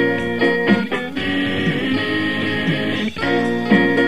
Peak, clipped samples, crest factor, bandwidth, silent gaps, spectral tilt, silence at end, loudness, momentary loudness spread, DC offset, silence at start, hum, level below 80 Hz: -2 dBFS; under 0.1%; 16 dB; 15 kHz; none; -6.5 dB/octave; 0 s; -18 LUFS; 6 LU; 1%; 0 s; none; -48 dBFS